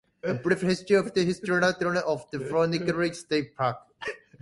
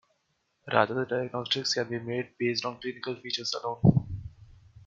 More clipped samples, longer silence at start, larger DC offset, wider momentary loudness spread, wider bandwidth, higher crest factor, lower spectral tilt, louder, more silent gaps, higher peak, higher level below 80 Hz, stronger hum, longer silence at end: neither; second, 0.25 s vs 0.65 s; neither; second, 8 LU vs 12 LU; first, 11.5 kHz vs 7.6 kHz; second, 18 dB vs 24 dB; about the same, -5.5 dB/octave vs -5.5 dB/octave; about the same, -27 LUFS vs -29 LUFS; neither; about the same, -8 dBFS vs -6 dBFS; second, -62 dBFS vs -52 dBFS; neither; first, 0.25 s vs 0.05 s